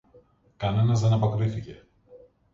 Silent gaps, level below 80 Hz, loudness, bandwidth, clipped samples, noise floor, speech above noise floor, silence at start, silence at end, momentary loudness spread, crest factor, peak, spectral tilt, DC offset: none; -52 dBFS; -25 LUFS; 7.6 kHz; under 0.1%; -58 dBFS; 35 dB; 0.6 s; 0.35 s; 14 LU; 14 dB; -12 dBFS; -7.5 dB/octave; under 0.1%